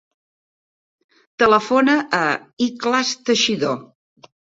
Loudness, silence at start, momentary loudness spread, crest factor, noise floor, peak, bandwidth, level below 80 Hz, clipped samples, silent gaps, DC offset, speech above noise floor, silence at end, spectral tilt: -18 LUFS; 1.4 s; 8 LU; 20 dB; under -90 dBFS; -2 dBFS; 8 kHz; -62 dBFS; under 0.1%; 2.53-2.57 s; under 0.1%; over 72 dB; 0.75 s; -3 dB/octave